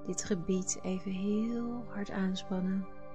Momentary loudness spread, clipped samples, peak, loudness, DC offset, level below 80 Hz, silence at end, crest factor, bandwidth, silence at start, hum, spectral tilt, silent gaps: 6 LU; under 0.1%; -20 dBFS; -35 LUFS; 0.6%; -58 dBFS; 0 s; 16 dB; 9.4 kHz; 0 s; none; -5 dB/octave; none